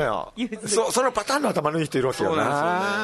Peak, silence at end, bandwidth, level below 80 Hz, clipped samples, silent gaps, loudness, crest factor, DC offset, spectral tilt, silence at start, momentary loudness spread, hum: -8 dBFS; 0 s; 12.5 kHz; -56 dBFS; under 0.1%; none; -23 LUFS; 16 dB; under 0.1%; -4 dB/octave; 0 s; 5 LU; none